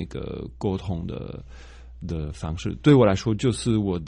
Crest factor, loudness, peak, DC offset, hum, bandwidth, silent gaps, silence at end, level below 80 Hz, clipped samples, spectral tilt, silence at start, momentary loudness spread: 20 dB; -24 LUFS; -4 dBFS; under 0.1%; none; 10.5 kHz; none; 0 s; -40 dBFS; under 0.1%; -7 dB/octave; 0 s; 18 LU